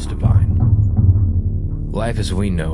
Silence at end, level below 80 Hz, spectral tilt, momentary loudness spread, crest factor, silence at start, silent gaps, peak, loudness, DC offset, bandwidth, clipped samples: 0 s; -24 dBFS; -7.5 dB/octave; 8 LU; 14 dB; 0 s; none; -2 dBFS; -17 LUFS; under 0.1%; 11.5 kHz; under 0.1%